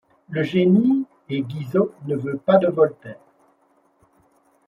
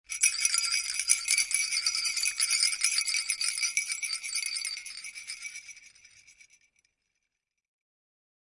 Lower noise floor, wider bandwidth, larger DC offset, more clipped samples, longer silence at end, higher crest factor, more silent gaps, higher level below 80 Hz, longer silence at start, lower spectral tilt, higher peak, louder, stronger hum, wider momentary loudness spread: second, -62 dBFS vs -84 dBFS; second, 5.4 kHz vs 12 kHz; neither; neither; second, 1.55 s vs 2.65 s; second, 20 dB vs 26 dB; neither; first, -66 dBFS vs -72 dBFS; first, 0.3 s vs 0.1 s; first, -9 dB/octave vs 6 dB/octave; first, -2 dBFS vs -6 dBFS; first, -21 LUFS vs -26 LUFS; neither; second, 12 LU vs 15 LU